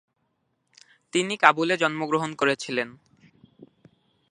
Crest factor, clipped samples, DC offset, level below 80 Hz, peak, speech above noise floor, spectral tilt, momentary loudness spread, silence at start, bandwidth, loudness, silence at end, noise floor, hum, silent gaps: 28 dB; under 0.1%; under 0.1%; -74 dBFS; 0 dBFS; 50 dB; -4 dB/octave; 10 LU; 1.15 s; 11 kHz; -24 LUFS; 1.4 s; -74 dBFS; none; none